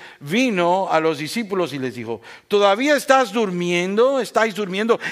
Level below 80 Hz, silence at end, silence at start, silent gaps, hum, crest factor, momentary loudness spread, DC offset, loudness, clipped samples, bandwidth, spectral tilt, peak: -70 dBFS; 0 s; 0 s; none; none; 18 dB; 10 LU; under 0.1%; -19 LUFS; under 0.1%; 15.5 kHz; -4.5 dB/octave; 0 dBFS